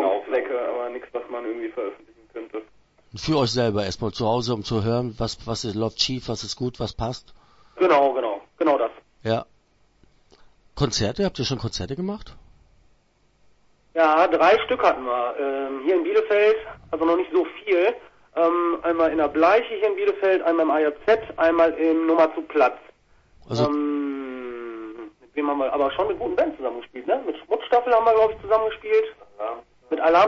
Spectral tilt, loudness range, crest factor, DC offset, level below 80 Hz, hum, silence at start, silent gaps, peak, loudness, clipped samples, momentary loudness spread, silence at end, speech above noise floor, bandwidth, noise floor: -5.5 dB/octave; 7 LU; 18 dB; under 0.1%; -50 dBFS; none; 0 s; none; -4 dBFS; -23 LUFS; under 0.1%; 14 LU; 0 s; 40 dB; 8 kHz; -62 dBFS